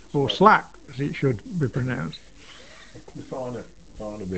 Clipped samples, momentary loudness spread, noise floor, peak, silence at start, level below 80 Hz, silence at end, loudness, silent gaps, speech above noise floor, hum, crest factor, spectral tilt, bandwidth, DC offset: under 0.1%; 26 LU; -47 dBFS; 0 dBFS; 0.15 s; -52 dBFS; 0 s; -23 LUFS; none; 23 dB; none; 24 dB; -6.5 dB/octave; 8.6 kHz; 0.3%